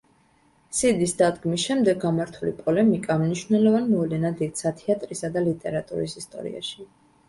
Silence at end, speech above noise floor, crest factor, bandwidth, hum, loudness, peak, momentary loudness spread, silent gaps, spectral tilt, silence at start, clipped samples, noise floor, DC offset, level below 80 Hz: 0.45 s; 38 dB; 18 dB; 11.5 kHz; none; -24 LUFS; -6 dBFS; 11 LU; none; -5.5 dB/octave; 0.7 s; under 0.1%; -61 dBFS; under 0.1%; -58 dBFS